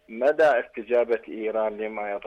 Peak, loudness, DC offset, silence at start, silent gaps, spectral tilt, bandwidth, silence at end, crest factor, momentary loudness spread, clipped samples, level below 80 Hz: -12 dBFS; -25 LUFS; under 0.1%; 0.1 s; none; -5.5 dB/octave; 9 kHz; 0 s; 12 dB; 9 LU; under 0.1%; -64 dBFS